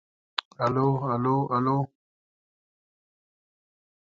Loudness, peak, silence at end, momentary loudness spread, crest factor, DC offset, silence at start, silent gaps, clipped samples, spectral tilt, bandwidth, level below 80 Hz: -27 LUFS; -4 dBFS; 2.3 s; 9 LU; 26 dB; under 0.1%; 0.6 s; none; under 0.1%; -8 dB/octave; 7.6 kHz; -66 dBFS